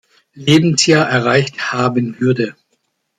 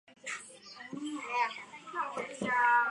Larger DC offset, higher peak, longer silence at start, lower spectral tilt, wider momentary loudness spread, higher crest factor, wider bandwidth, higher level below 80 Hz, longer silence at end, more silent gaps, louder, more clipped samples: neither; first, 0 dBFS vs -16 dBFS; first, 0.35 s vs 0.1 s; first, -4.5 dB/octave vs -3 dB/octave; second, 8 LU vs 18 LU; about the same, 14 dB vs 18 dB; about the same, 12 kHz vs 11 kHz; first, -54 dBFS vs -80 dBFS; first, 0.7 s vs 0 s; neither; first, -14 LUFS vs -33 LUFS; neither